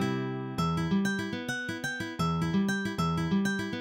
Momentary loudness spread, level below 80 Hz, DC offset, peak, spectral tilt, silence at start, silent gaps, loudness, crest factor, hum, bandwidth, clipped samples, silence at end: 5 LU; -54 dBFS; under 0.1%; -16 dBFS; -5.5 dB/octave; 0 s; none; -30 LUFS; 14 dB; none; 16.5 kHz; under 0.1%; 0 s